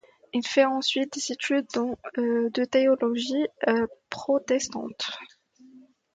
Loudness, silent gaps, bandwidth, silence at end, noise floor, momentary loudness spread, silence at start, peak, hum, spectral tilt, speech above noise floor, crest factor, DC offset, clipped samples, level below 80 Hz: -26 LUFS; none; 9.2 kHz; 0.35 s; -54 dBFS; 10 LU; 0.35 s; -8 dBFS; none; -3 dB/octave; 28 dB; 20 dB; under 0.1%; under 0.1%; -68 dBFS